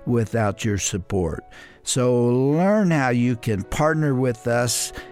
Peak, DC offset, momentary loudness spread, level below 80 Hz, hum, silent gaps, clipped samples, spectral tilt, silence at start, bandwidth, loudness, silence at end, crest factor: -8 dBFS; under 0.1%; 7 LU; -44 dBFS; none; none; under 0.1%; -5.5 dB/octave; 0 s; 16 kHz; -21 LUFS; 0 s; 12 dB